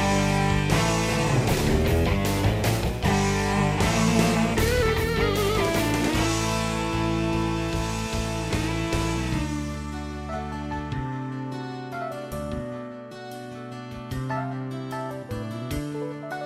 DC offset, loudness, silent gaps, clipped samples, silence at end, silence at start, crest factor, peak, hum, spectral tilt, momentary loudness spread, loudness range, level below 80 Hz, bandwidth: under 0.1%; -25 LUFS; none; under 0.1%; 0 s; 0 s; 18 dB; -8 dBFS; none; -5 dB/octave; 11 LU; 10 LU; -36 dBFS; 16 kHz